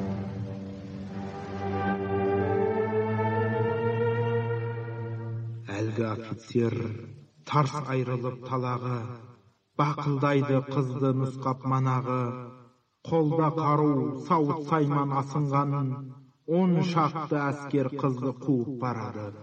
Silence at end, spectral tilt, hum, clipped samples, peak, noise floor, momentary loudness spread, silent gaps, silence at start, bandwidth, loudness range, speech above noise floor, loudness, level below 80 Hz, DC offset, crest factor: 0 s; -8.5 dB/octave; none; under 0.1%; -10 dBFS; -56 dBFS; 12 LU; none; 0 s; 8.4 kHz; 4 LU; 29 dB; -28 LUFS; -66 dBFS; under 0.1%; 18 dB